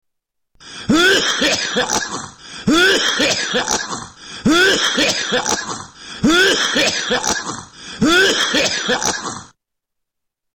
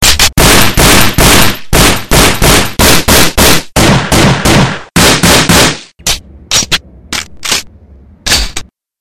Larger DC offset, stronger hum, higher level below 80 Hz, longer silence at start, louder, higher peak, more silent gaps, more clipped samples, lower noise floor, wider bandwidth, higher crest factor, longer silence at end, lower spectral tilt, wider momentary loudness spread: neither; neither; second, -46 dBFS vs -18 dBFS; first, 0.6 s vs 0 s; second, -15 LUFS vs -6 LUFS; second, -6 dBFS vs 0 dBFS; neither; second, under 0.1% vs 3%; first, -77 dBFS vs -37 dBFS; second, 18 kHz vs over 20 kHz; about the same, 12 dB vs 8 dB; first, 1.1 s vs 0 s; about the same, -2 dB/octave vs -3 dB/octave; first, 16 LU vs 11 LU